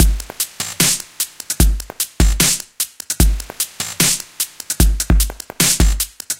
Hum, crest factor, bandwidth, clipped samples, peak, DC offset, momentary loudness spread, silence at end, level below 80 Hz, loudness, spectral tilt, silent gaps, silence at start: none; 18 dB; 17.5 kHz; under 0.1%; 0 dBFS; under 0.1%; 9 LU; 0.05 s; -20 dBFS; -17 LUFS; -2.5 dB/octave; none; 0 s